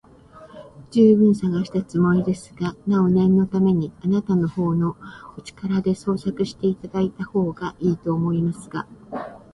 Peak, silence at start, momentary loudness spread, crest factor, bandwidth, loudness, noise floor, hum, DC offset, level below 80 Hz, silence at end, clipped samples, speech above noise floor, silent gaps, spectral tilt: -4 dBFS; 0.35 s; 16 LU; 16 dB; 11 kHz; -21 LUFS; -46 dBFS; none; under 0.1%; -52 dBFS; 0.15 s; under 0.1%; 26 dB; none; -8.5 dB/octave